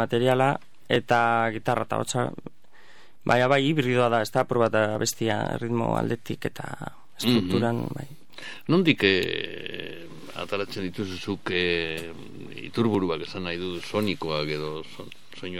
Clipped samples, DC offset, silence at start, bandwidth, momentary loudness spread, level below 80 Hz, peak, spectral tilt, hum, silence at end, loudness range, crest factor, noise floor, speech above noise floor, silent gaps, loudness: under 0.1%; 0.9%; 0 s; 17 kHz; 18 LU; -60 dBFS; -4 dBFS; -5 dB/octave; none; 0 s; 5 LU; 22 dB; -56 dBFS; 30 dB; none; -25 LUFS